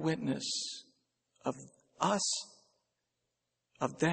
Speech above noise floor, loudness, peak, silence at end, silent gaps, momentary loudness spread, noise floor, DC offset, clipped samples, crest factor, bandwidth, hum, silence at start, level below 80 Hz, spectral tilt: 51 dB; -35 LUFS; -14 dBFS; 0 s; none; 14 LU; -85 dBFS; under 0.1%; under 0.1%; 22 dB; 8.8 kHz; none; 0 s; -76 dBFS; -3.5 dB/octave